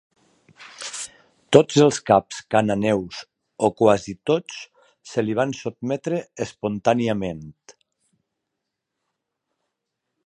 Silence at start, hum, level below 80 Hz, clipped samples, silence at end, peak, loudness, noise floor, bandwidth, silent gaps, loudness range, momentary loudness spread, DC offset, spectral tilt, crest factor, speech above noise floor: 0.6 s; none; -58 dBFS; under 0.1%; 2.55 s; 0 dBFS; -21 LUFS; -81 dBFS; 11.5 kHz; none; 8 LU; 17 LU; under 0.1%; -5.5 dB/octave; 24 dB; 60 dB